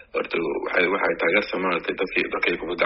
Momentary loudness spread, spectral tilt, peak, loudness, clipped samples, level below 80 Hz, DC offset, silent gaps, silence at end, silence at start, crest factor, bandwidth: 5 LU; -2 dB/octave; -6 dBFS; -23 LUFS; under 0.1%; -54 dBFS; under 0.1%; none; 0 s; 0 s; 18 dB; 5.8 kHz